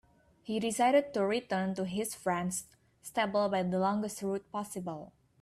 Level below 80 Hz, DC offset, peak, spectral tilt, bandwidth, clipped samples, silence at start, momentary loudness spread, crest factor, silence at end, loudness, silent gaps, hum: -70 dBFS; under 0.1%; -16 dBFS; -5 dB/octave; 15 kHz; under 0.1%; 0.45 s; 12 LU; 18 dB; 0.3 s; -32 LUFS; none; none